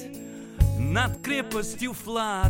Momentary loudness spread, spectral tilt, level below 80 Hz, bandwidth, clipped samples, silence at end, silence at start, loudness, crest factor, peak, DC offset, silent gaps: 14 LU; -5 dB/octave; -34 dBFS; 17 kHz; under 0.1%; 0 s; 0 s; -27 LUFS; 20 dB; -6 dBFS; under 0.1%; none